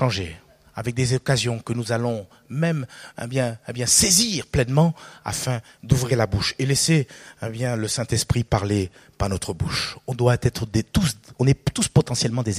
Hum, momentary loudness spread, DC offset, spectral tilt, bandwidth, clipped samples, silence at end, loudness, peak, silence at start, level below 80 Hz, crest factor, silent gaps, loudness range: none; 12 LU; under 0.1%; -4 dB/octave; 15.5 kHz; under 0.1%; 0 s; -22 LUFS; 0 dBFS; 0 s; -42 dBFS; 22 dB; none; 5 LU